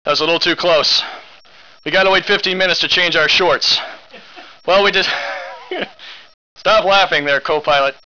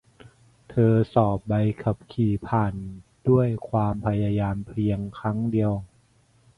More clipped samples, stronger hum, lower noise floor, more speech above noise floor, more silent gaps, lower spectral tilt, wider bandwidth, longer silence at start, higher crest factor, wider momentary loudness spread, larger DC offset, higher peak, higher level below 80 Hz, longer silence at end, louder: neither; neither; second, -45 dBFS vs -61 dBFS; second, 30 dB vs 37 dB; first, 6.34-6.56 s vs none; second, -2.5 dB/octave vs -10 dB/octave; first, 5.4 kHz vs 4.7 kHz; second, 0.05 s vs 0.7 s; second, 10 dB vs 20 dB; first, 15 LU vs 8 LU; first, 0.7% vs under 0.1%; about the same, -6 dBFS vs -6 dBFS; about the same, -48 dBFS vs -48 dBFS; second, 0.2 s vs 0.7 s; first, -13 LUFS vs -25 LUFS